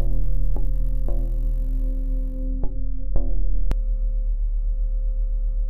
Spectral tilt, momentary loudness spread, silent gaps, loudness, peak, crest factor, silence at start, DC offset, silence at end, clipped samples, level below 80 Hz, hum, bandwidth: -9.5 dB/octave; 2 LU; none; -29 LUFS; -6 dBFS; 12 dB; 0 s; under 0.1%; 0 s; under 0.1%; -22 dBFS; none; 1.5 kHz